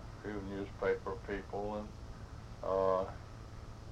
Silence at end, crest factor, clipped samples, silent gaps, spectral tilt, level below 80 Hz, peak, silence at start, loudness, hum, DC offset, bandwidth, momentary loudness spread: 0 s; 20 dB; under 0.1%; none; -7 dB/octave; -52 dBFS; -20 dBFS; 0 s; -38 LUFS; none; under 0.1%; 11 kHz; 17 LU